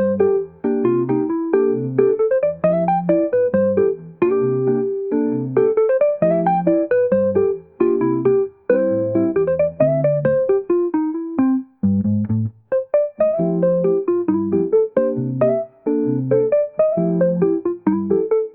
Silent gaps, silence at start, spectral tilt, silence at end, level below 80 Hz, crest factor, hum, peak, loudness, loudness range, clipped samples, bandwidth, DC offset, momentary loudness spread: none; 0 s; -14 dB/octave; 0.05 s; -60 dBFS; 14 dB; none; -4 dBFS; -18 LUFS; 2 LU; under 0.1%; 3.3 kHz; 0.1%; 4 LU